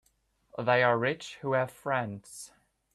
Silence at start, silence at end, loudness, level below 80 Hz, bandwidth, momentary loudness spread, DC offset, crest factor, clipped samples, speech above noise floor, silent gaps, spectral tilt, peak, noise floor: 0.55 s; 0.5 s; -29 LUFS; -70 dBFS; 14 kHz; 21 LU; under 0.1%; 20 dB; under 0.1%; 42 dB; none; -5 dB/octave; -12 dBFS; -71 dBFS